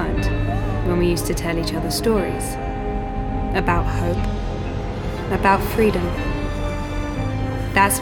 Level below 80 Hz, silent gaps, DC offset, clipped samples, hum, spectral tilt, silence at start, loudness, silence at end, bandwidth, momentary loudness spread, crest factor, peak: -28 dBFS; none; under 0.1%; under 0.1%; none; -5.5 dB/octave; 0 s; -22 LUFS; 0 s; 19 kHz; 9 LU; 20 dB; -2 dBFS